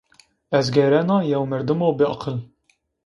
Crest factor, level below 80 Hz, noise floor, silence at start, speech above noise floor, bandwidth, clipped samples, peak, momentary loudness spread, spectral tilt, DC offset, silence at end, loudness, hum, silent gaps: 18 dB; -58 dBFS; -66 dBFS; 0.5 s; 47 dB; 11 kHz; under 0.1%; -4 dBFS; 10 LU; -7 dB/octave; under 0.1%; 0.6 s; -20 LUFS; none; none